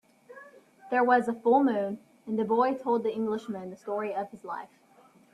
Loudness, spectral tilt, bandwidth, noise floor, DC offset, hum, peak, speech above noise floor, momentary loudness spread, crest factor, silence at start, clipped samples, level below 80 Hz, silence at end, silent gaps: -28 LUFS; -7 dB/octave; 11.5 kHz; -59 dBFS; under 0.1%; none; -10 dBFS; 32 dB; 15 LU; 18 dB; 0.3 s; under 0.1%; -76 dBFS; 0.65 s; none